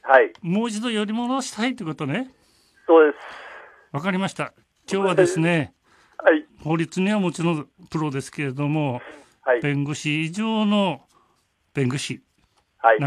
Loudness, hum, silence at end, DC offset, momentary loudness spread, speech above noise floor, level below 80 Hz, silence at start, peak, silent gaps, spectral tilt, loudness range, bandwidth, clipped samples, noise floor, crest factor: -23 LUFS; none; 0 s; under 0.1%; 16 LU; 44 dB; -66 dBFS; 0.05 s; -2 dBFS; none; -5.5 dB/octave; 3 LU; 12.5 kHz; under 0.1%; -66 dBFS; 22 dB